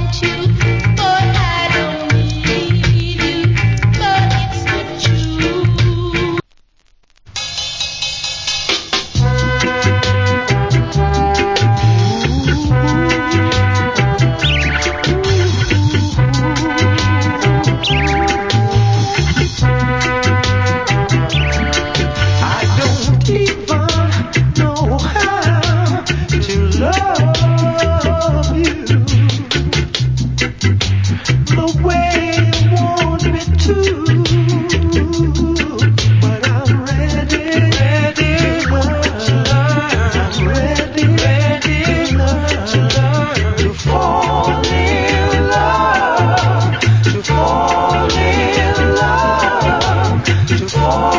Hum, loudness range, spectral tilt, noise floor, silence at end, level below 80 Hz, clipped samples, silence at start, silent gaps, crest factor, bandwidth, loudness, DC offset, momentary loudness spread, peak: none; 2 LU; -5.5 dB/octave; -51 dBFS; 0 s; -24 dBFS; under 0.1%; 0 s; none; 14 dB; 7.6 kHz; -14 LUFS; under 0.1%; 3 LU; 0 dBFS